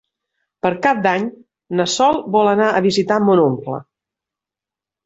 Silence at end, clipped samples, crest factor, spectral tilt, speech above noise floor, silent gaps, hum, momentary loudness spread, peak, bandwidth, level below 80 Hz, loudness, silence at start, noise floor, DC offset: 1.25 s; under 0.1%; 16 dB; -5 dB/octave; 72 dB; none; none; 11 LU; -2 dBFS; 8.2 kHz; -58 dBFS; -16 LUFS; 0.65 s; -88 dBFS; under 0.1%